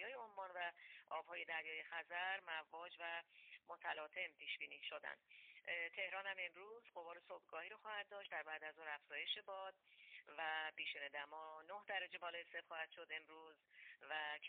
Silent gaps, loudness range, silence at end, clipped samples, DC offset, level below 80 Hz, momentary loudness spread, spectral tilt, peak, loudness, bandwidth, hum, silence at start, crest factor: none; 2 LU; 0 s; under 0.1%; under 0.1%; under -90 dBFS; 14 LU; 3 dB/octave; -32 dBFS; -49 LUFS; 4.5 kHz; none; 0 s; 20 dB